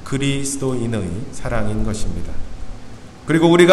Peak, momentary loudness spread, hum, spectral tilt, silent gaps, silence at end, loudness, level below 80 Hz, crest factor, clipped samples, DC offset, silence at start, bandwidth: 0 dBFS; 21 LU; none; -5.5 dB/octave; none; 0 s; -20 LUFS; -30 dBFS; 18 dB; under 0.1%; under 0.1%; 0 s; 13 kHz